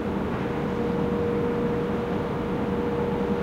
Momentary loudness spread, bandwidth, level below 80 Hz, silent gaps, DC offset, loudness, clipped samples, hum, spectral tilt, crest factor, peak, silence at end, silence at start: 2 LU; 15 kHz; -42 dBFS; none; under 0.1%; -27 LUFS; under 0.1%; none; -8.5 dB/octave; 12 dB; -14 dBFS; 0 s; 0 s